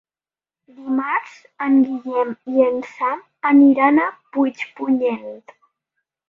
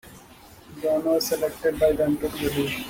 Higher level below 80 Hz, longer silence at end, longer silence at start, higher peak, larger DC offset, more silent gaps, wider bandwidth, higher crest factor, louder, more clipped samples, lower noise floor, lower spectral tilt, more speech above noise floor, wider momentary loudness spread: second, -70 dBFS vs -48 dBFS; first, 0.9 s vs 0 s; first, 0.8 s vs 0.05 s; first, -2 dBFS vs -8 dBFS; neither; neither; second, 5.8 kHz vs 17 kHz; about the same, 18 dB vs 16 dB; first, -18 LUFS vs -24 LUFS; neither; first, under -90 dBFS vs -48 dBFS; first, -6.5 dB/octave vs -4.5 dB/octave; first, over 72 dB vs 25 dB; first, 12 LU vs 5 LU